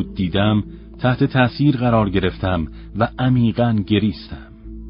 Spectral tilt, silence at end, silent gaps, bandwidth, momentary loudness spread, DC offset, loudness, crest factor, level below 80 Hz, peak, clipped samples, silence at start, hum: -12.5 dB/octave; 0 s; none; 5.4 kHz; 15 LU; under 0.1%; -19 LUFS; 16 dB; -36 dBFS; -2 dBFS; under 0.1%; 0 s; none